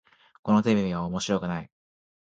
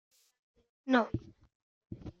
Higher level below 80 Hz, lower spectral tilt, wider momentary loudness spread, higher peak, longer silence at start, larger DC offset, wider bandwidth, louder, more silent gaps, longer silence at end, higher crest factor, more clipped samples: about the same, -56 dBFS vs -60 dBFS; about the same, -6 dB/octave vs -7 dB/octave; second, 12 LU vs 19 LU; first, -8 dBFS vs -14 dBFS; second, 0.45 s vs 0.85 s; neither; first, 8.8 kHz vs 7 kHz; first, -26 LUFS vs -32 LUFS; second, none vs 1.55-1.81 s; first, 0.7 s vs 0.1 s; about the same, 20 dB vs 22 dB; neither